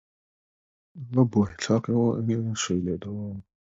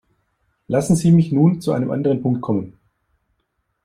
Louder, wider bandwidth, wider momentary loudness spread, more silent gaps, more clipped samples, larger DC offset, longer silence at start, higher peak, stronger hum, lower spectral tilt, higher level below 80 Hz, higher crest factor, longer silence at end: second, -26 LUFS vs -18 LUFS; second, 8 kHz vs 13 kHz; first, 13 LU vs 9 LU; neither; neither; neither; first, 0.95 s vs 0.7 s; second, -8 dBFS vs -4 dBFS; neither; second, -6 dB/octave vs -8 dB/octave; about the same, -52 dBFS vs -54 dBFS; about the same, 20 dB vs 16 dB; second, 0.4 s vs 1.15 s